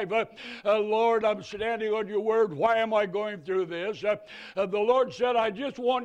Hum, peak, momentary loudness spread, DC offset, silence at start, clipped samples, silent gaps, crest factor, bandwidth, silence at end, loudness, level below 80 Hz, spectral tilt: none; -12 dBFS; 8 LU; under 0.1%; 0 s; under 0.1%; none; 16 dB; 8.8 kHz; 0 s; -27 LUFS; -66 dBFS; -5.5 dB/octave